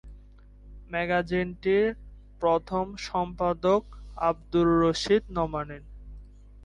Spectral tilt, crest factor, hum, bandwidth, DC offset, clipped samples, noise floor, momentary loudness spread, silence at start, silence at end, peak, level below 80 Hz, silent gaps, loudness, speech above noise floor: -6 dB/octave; 16 dB; 50 Hz at -45 dBFS; 11 kHz; under 0.1%; under 0.1%; -50 dBFS; 15 LU; 0.05 s; 0 s; -12 dBFS; -46 dBFS; none; -27 LUFS; 24 dB